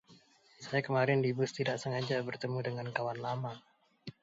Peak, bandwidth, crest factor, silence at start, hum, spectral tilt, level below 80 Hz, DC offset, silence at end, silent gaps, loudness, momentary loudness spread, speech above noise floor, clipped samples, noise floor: -16 dBFS; 8 kHz; 20 dB; 0.1 s; none; -6 dB/octave; -76 dBFS; under 0.1%; 0.1 s; none; -34 LUFS; 18 LU; 29 dB; under 0.1%; -63 dBFS